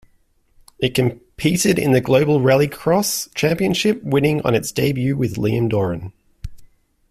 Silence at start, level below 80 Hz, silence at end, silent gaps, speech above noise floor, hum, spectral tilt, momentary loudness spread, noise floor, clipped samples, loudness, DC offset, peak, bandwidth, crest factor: 0.8 s; -44 dBFS; 0.45 s; none; 42 dB; none; -5.5 dB/octave; 10 LU; -59 dBFS; under 0.1%; -18 LUFS; under 0.1%; -2 dBFS; 16 kHz; 16 dB